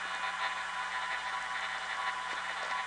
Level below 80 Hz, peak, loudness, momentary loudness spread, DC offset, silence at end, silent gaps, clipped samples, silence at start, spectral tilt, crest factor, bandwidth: -70 dBFS; -22 dBFS; -35 LUFS; 2 LU; under 0.1%; 0 s; none; under 0.1%; 0 s; 0 dB/octave; 14 dB; 10 kHz